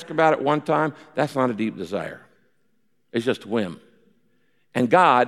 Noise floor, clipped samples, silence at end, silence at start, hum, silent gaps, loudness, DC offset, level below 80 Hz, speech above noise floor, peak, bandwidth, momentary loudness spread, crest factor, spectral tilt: -71 dBFS; under 0.1%; 0 s; 0 s; none; none; -23 LUFS; under 0.1%; -70 dBFS; 50 dB; -4 dBFS; 14 kHz; 13 LU; 20 dB; -6.5 dB/octave